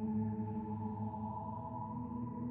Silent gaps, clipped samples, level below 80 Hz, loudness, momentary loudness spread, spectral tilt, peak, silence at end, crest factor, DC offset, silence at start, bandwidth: none; under 0.1%; -62 dBFS; -42 LUFS; 5 LU; -12 dB/octave; -28 dBFS; 0 s; 12 dB; under 0.1%; 0 s; 2.9 kHz